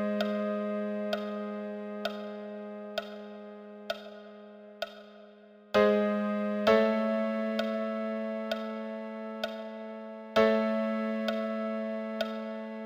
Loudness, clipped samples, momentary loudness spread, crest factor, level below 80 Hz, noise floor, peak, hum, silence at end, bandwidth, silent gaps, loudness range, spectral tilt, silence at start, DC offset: -32 LUFS; under 0.1%; 18 LU; 22 dB; -70 dBFS; -54 dBFS; -10 dBFS; none; 0 s; 15 kHz; none; 12 LU; -6.5 dB/octave; 0 s; under 0.1%